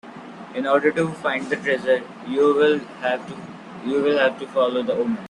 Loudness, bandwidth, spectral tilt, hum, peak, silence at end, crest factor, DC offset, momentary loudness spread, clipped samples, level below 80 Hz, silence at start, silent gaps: -21 LUFS; 10.5 kHz; -5.5 dB/octave; none; -4 dBFS; 0 s; 16 dB; under 0.1%; 15 LU; under 0.1%; -66 dBFS; 0.05 s; none